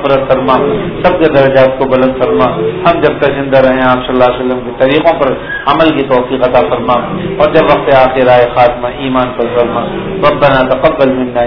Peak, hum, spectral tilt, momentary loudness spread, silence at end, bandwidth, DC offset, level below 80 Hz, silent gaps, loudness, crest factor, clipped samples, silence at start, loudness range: 0 dBFS; none; -8.5 dB/octave; 6 LU; 0 s; 5.4 kHz; under 0.1%; -32 dBFS; none; -9 LUFS; 10 dB; 1%; 0 s; 1 LU